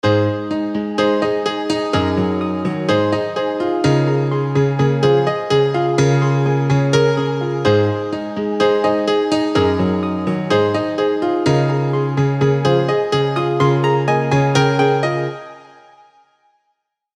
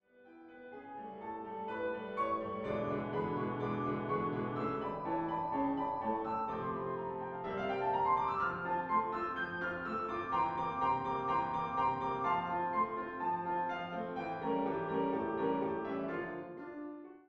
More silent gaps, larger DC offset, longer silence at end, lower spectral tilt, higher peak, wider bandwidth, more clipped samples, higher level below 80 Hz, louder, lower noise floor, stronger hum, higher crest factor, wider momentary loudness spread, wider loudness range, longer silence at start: neither; neither; first, 1.55 s vs 0.1 s; second, -6.5 dB/octave vs -8 dB/octave; first, -2 dBFS vs -22 dBFS; first, 9.6 kHz vs 6.8 kHz; neither; first, -50 dBFS vs -66 dBFS; first, -17 LUFS vs -36 LUFS; first, -71 dBFS vs -58 dBFS; neither; about the same, 14 dB vs 16 dB; second, 5 LU vs 9 LU; about the same, 2 LU vs 3 LU; second, 0.05 s vs 0.2 s